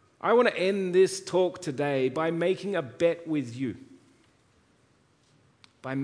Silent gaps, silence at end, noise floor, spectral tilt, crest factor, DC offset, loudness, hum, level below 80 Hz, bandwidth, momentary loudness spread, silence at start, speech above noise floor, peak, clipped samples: none; 0 s; -65 dBFS; -5.5 dB/octave; 18 dB; under 0.1%; -27 LUFS; none; -72 dBFS; 10.5 kHz; 12 LU; 0.25 s; 39 dB; -10 dBFS; under 0.1%